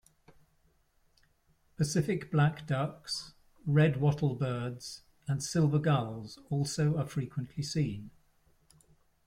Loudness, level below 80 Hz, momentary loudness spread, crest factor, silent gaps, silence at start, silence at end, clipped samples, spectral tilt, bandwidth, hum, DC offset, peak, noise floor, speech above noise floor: -32 LUFS; -62 dBFS; 14 LU; 18 dB; none; 1.8 s; 1.15 s; under 0.1%; -6 dB/octave; 13.5 kHz; none; under 0.1%; -14 dBFS; -70 dBFS; 39 dB